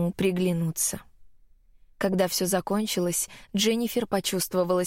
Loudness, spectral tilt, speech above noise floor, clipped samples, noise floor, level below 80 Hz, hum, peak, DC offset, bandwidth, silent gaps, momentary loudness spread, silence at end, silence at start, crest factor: -26 LUFS; -4 dB/octave; 30 dB; under 0.1%; -56 dBFS; -56 dBFS; none; -12 dBFS; under 0.1%; 16.5 kHz; none; 4 LU; 0 s; 0 s; 14 dB